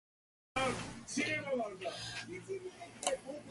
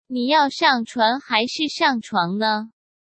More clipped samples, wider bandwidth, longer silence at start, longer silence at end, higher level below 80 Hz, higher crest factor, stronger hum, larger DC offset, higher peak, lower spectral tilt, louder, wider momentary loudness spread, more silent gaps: neither; first, 11.5 kHz vs 8.8 kHz; first, 0.55 s vs 0.1 s; second, 0 s vs 0.35 s; first, -66 dBFS vs -72 dBFS; about the same, 22 dB vs 18 dB; neither; neither; second, -18 dBFS vs -4 dBFS; about the same, -3 dB/octave vs -4 dB/octave; second, -39 LUFS vs -20 LUFS; first, 9 LU vs 5 LU; neither